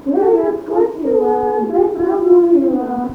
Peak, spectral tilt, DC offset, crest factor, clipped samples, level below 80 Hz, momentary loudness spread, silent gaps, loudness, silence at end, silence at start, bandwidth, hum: -2 dBFS; -9 dB/octave; under 0.1%; 14 dB; under 0.1%; -48 dBFS; 6 LU; none; -15 LUFS; 0 s; 0 s; 3.4 kHz; none